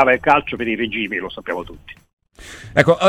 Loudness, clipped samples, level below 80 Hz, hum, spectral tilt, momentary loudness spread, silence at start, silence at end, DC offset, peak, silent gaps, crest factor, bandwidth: -19 LUFS; under 0.1%; -46 dBFS; none; -5.5 dB/octave; 22 LU; 0 s; 0 s; under 0.1%; 0 dBFS; 2.13-2.17 s; 18 dB; 14 kHz